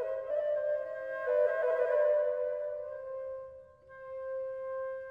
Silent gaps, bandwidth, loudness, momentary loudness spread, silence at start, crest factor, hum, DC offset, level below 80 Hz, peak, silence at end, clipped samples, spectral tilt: none; 3.8 kHz; -33 LUFS; 14 LU; 0 s; 16 dB; none; under 0.1%; -74 dBFS; -18 dBFS; 0 s; under 0.1%; -5 dB/octave